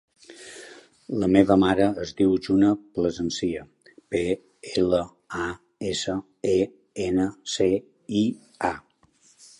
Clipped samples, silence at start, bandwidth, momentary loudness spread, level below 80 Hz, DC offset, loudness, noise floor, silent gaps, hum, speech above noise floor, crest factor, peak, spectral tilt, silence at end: under 0.1%; 0.3 s; 11 kHz; 13 LU; -52 dBFS; under 0.1%; -25 LUFS; -61 dBFS; none; none; 37 dB; 24 dB; -2 dBFS; -5.5 dB/octave; 0.8 s